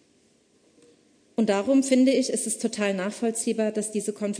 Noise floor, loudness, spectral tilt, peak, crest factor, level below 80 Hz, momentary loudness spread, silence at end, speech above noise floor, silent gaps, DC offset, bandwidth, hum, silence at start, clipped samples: -63 dBFS; -24 LUFS; -4 dB/octave; -8 dBFS; 18 dB; -74 dBFS; 8 LU; 0 s; 39 dB; none; under 0.1%; 11 kHz; none; 1.4 s; under 0.1%